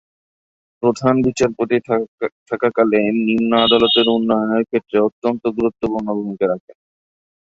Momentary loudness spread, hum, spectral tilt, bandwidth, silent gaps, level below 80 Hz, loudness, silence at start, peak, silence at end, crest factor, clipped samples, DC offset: 9 LU; none; -5.5 dB/octave; 8 kHz; 2.08-2.18 s, 2.32-2.46 s, 5.12-5.22 s, 6.60-6.68 s; -52 dBFS; -17 LUFS; 0.8 s; -2 dBFS; 0.85 s; 16 dB; under 0.1%; under 0.1%